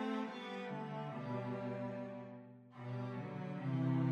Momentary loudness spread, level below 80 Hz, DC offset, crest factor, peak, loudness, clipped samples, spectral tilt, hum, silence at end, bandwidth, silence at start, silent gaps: 13 LU; -80 dBFS; under 0.1%; 16 dB; -26 dBFS; -43 LUFS; under 0.1%; -8.5 dB/octave; none; 0 s; 7 kHz; 0 s; none